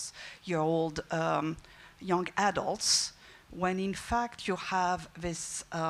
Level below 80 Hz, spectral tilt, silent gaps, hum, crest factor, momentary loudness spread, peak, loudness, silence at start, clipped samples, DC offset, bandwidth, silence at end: -56 dBFS; -3.5 dB/octave; none; none; 18 dB; 11 LU; -14 dBFS; -31 LUFS; 0 s; under 0.1%; under 0.1%; 15.5 kHz; 0 s